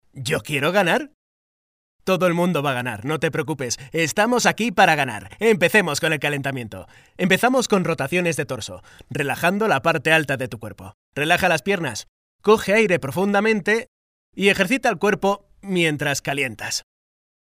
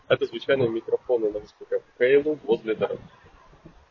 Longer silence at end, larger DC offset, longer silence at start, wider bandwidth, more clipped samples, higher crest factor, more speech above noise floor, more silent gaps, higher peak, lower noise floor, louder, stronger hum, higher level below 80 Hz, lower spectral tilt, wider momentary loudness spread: first, 0.6 s vs 0.2 s; neither; about the same, 0.15 s vs 0.1 s; first, 16 kHz vs 6.4 kHz; neither; about the same, 20 dB vs 18 dB; first, over 69 dB vs 27 dB; first, 1.14-1.99 s, 10.94-11.12 s, 12.09-12.39 s, 13.88-14.33 s vs none; first, -2 dBFS vs -6 dBFS; first, under -90 dBFS vs -51 dBFS; first, -20 LUFS vs -25 LUFS; neither; about the same, -56 dBFS vs -60 dBFS; second, -4.5 dB/octave vs -7.5 dB/octave; about the same, 11 LU vs 11 LU